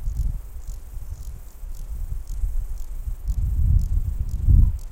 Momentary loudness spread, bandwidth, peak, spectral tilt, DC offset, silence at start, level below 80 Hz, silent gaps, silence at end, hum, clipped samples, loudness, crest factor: 19 LU; 16 kHz; -6 dBFS; -8 dB/octave; under 0.1%; 0 s; -24 dBFS; none; 0 s; none; under 0.1%; -26 LUFS; 18 dB